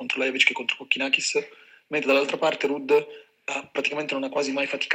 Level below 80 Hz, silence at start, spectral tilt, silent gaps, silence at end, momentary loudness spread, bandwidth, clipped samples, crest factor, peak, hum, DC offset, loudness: -84 dBFS; 0 s; -2 dB/octave; none; 0 s; 10 LU; 16 kHz; under 0.1%; 22 dB; -4 dBFS; none; under 0.1%; -24 LUFS